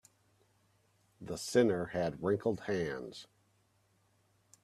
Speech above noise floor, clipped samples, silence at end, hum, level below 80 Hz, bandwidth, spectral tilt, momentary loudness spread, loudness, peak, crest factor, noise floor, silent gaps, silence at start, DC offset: 39 dB; under 0.1%; 1.4 s; none; -68 dBFS; 13.5 kHz; -5.5 dB/octave; 18 LU; -34 LUFS; -16 dBFS; 22 dB; -73 dBFS; none; 1.2 s; under 0.1%